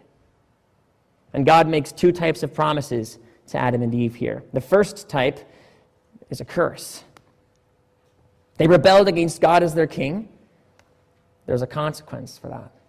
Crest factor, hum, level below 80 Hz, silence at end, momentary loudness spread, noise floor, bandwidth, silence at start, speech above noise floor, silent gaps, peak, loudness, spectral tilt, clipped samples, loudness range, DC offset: 16 dB; none; -52 dBFS; 0.25 s; 21 LU; -63 dBFS; 15.5 kHz; 1.35 s; 43 dB; none; -6 dBFS; -20 LUFS; -6 dB/octave; under 0.1%; 9 LU; under 0.1%